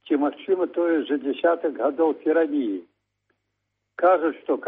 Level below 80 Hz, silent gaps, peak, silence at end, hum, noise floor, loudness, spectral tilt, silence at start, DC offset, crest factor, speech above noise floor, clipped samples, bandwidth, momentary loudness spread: -74 dBFS; none; -8 dBFS; 0 s; 50 Hz at -80 dBFS; -78 dBFS; -23 LUFS; -2.5 dB/octave; 0.05 s; under 0.1%; 16 dB; 56 dB; under 0.1%; 4 kHz; 6 LU